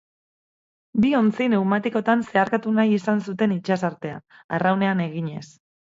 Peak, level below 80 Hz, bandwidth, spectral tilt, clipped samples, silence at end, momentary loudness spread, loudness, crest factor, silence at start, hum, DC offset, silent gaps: -4 dBFS; -62 dBFS; 7.6 kHz; -7.5 dB/octave; under 0.1%; 0.5 s; 11 LU; -22 LUFS; 18 dB; 0.95 s; none; under 0.1%; 4.44-4.49 s